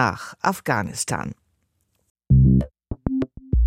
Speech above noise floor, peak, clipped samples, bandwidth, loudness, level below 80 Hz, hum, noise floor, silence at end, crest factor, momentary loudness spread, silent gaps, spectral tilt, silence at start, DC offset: 45 dB; -4 dBFS; under 0.1%; 14.5 kHz; -22 LUFS; -30 dBFS; none; -70 dBFS; 0 s; 16 dB; 14 LU; 2.10-2.15 s; -6 dB/octave; 0 s; under 0.1%